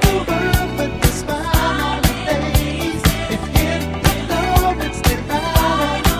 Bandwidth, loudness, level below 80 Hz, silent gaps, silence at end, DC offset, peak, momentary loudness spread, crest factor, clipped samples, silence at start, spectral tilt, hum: 16 kHz; -18 LUFS; -22 dBFS; none; 0 s; 0.2%; 0 dBFS; 4 LU; 16 dB; under 0.1%; 0 s; -5 dB/octave; none